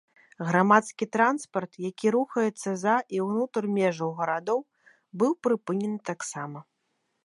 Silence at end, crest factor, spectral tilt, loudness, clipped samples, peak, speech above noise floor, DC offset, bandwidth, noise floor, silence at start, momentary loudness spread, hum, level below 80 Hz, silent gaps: 0.65 s; 22 dB; -6 dB/octave; -27 LUFS; under 0.1%; -4 dBFS; 50 dB; under 0.1%; 11.5 kHz; -76 dBFS; 0.4 s; 12 LU; none; -78 dBFS; none